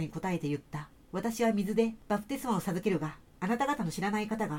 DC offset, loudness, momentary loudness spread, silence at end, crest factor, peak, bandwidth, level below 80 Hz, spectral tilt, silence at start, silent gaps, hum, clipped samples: under 0.1%; -33 LUFS; 9 LU; 0 s; 18 dB; -14 dBFS; 17 kHz; -60 dBFS; -6 dB/octave; 0 s; none; none; under 0.1%